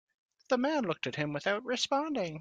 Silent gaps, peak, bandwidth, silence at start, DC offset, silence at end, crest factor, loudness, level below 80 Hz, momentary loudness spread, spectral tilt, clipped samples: none; -16 dBFS; 9.4 kHz; 0.5 s; under 0.1%; 0 s; 18 dB; -32 LUFS; -74 dBFS; 4 LU; -4.5 dB/octave; under 0.1%